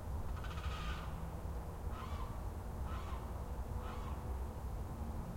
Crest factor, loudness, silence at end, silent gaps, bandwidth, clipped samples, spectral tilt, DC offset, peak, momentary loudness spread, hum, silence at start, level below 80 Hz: 12 dB; -45 LUFS; 0 s; none; 16.5 kHz; under 0.1%; -6.5 dB/octave; under 0.1%; -30 dBFS; 2 LU; none; 0 s; -46 dBFS